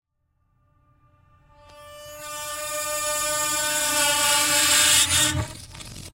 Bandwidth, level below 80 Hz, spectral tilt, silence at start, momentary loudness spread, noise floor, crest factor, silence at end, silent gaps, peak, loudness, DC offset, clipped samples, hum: 16 kHz; -50 dBFS; -0.5 dB/octave; 1.75 s; 22 LU; -70 dBFS; 20 dB; 0.05 s; none; -6 dBFS; -19 LUFS; under 0.1%; under 0.1%; none